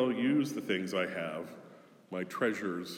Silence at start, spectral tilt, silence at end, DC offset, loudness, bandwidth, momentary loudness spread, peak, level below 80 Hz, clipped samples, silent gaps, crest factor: 0 s; -5.5 dB/octave; 0 s; under 0.1%; -34 LUFS; 17 kHz; 13 LU; -18 dBFS; -86 dBFS; under 0.1%; none; 16 dB